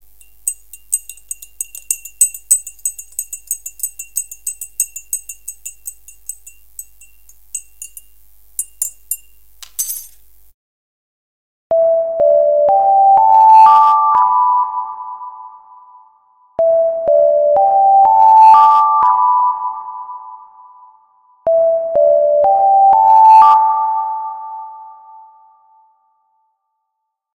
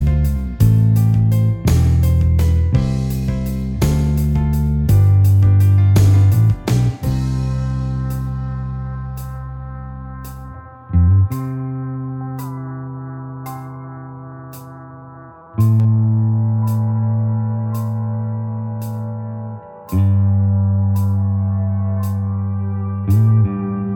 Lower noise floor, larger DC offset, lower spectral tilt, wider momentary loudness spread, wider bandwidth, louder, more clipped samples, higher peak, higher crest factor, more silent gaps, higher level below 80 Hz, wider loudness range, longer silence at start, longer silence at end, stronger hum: first, -75 dBFS vs -38 dBFS; neither; second, -0.5 dB/octave vs -8.5 dB/octave; first, 22 LU vs 18 LU; about the same, 17 kHz vs 16.5 kHz; first, -12 LUFS vs -17 LUFS; neither; about the same, 0 dBFS vs 0 dBFS; about the same, 14 dB vs 16 dB; first, 10.54-11.70 s vs none; second, -58 dBFS vs -26 dBFS; first, 16 LU vs 11 LU; first, 0.45 s vs 0 s; first, 2.45 s vs 0 s; neither